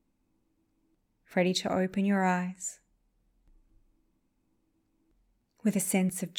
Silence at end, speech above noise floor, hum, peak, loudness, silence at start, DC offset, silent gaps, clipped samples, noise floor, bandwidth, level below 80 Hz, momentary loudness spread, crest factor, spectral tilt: 0 s; 45 dB; none; -14 dBFS; -30 LUFS; 1.3 s; under 0.1%; none; under 0.1%; -74 dBFS; 18.5 kHz; -70 dBFS; 8 LU; 20 dB; -5 dB/octave